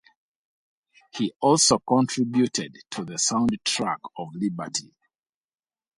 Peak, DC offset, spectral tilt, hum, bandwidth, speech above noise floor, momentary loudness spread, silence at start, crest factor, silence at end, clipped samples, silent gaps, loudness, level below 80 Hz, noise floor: -6 dBFS; under 0.1%; -3.5 dB/octave; none; 11.5 kHz; over 66 dB; 14 LU; 1.15 s; 20 dB; 1.15 s; under 0.1%; 1.36-1.40 s; -24 LUFS; -60 dBFS; under -90 dBFS